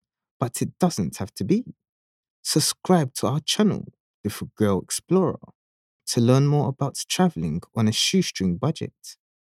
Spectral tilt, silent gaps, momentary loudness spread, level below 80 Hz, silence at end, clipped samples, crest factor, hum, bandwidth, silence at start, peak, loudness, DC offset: -5 dB/octave; 1.89-2.23 s, 2.30-2.43 s, 4.00-4.24 s, 5.55-6.00 s; 13 LU; -58 dBFS; 0.35 s; under 0.1%; 20 dB; none; 16 kHz; 0.4 s; -4 dBFS; -23 LUFS; under 0.1%